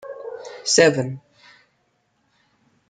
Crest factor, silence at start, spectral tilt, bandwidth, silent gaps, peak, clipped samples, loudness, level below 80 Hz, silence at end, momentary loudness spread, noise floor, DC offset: 22 dB; 0.05 s; -3 dB/octave; 9.6 kHz; none; -2 dBFS; under 0.1%; -18 LUFS; -66 dBFS; 1.7 s; 20 LU; -68 dBFS; under 0.1%